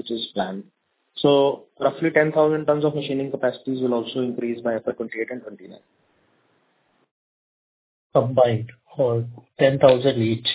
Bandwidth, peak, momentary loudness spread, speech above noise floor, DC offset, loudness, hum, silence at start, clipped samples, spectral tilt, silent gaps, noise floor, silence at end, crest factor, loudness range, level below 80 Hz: 4 kHz; -2 dBFS; 12 LU; 44 dB; under 0.1%; -22 LUFS; none; 0.05 s; under 0.1%; -10.5 dB/octave; 7.11-8.10 s; -66 dBFS; 0 s; 20 dB; 10 LU; -62 dBFS